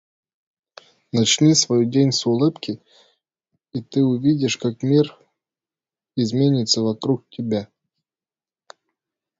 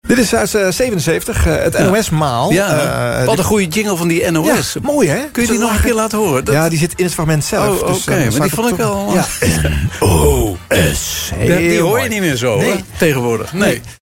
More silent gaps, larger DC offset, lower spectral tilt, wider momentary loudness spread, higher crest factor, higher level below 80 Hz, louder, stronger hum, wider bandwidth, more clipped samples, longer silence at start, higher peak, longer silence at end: neither; neither; about the same, -5 dB/octave vs -5 dB/octave; first, 14 LU vs 3 LU; about the same, 18 dB vs 14 dB; second, -62 dBFS vs -28 dBFS; second, -19 LUFS vs -14 LUFS; neither; second, 8 kHz vs 16.5 kHz; neither; first, 1.15 s vs 0.05 s; second, -4 dBFS vs 0 dBFS; first, 1.75 s vs 0.05 s